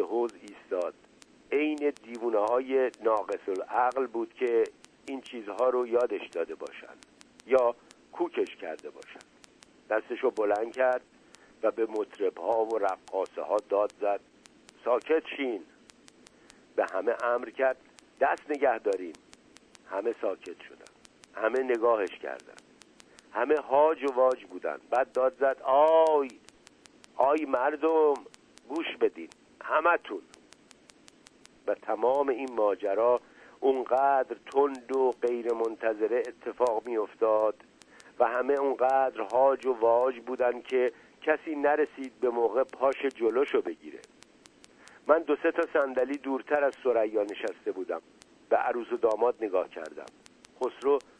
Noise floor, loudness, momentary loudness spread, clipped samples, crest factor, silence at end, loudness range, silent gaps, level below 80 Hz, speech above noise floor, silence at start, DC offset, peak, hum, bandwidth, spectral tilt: -58 dBFS; -29 LUFS; 13 LU; under 0.1%; 20 dB; 0.2 s; 5 LU; none; -74 dBFS; 30 dB; 0 s; under 0.1%; -8 dBFS; none; 10.5 kHz; -4.5 dB/octave